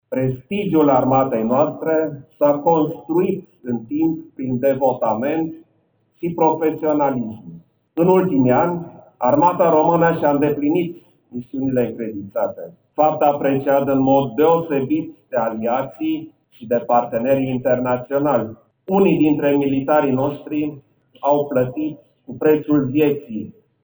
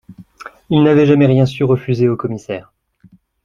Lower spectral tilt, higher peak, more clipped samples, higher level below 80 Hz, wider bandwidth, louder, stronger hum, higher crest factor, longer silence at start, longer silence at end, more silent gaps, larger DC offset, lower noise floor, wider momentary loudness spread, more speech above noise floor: first, -12.5 dB/octave vs -8.5 dB/octave; about the same, -2 dBFS vs -2 dBFS; neither; second, -54 dBFS vs -48 dBFS; first, over 20 kHz vs 7.4 kHz; second, -19 LUFS vs -14 LUFS; neither; about the same, 16 dB vs 14 dB; about the same, 0.1 s vs 0.1 s; second, 0.35 s vs 0.85 s; neither; neither; first, -63 dBFS vs -49 dBFS; second, 13 LU vs 16 LU; first, 45 dB vs 36 dB